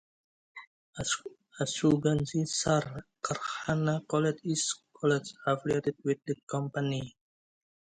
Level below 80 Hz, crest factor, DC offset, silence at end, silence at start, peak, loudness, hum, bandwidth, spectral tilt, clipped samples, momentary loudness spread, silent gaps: -62 dBFS; 20 dB; under 0.1%; 0.75 s; 0.55 s; -12 dBFS; -31 LUFS; none; 9.4 kHz; -5 dB/octave; under 0.1%; 15 LU; 0.67-0.93 s, 6.43-6.47 s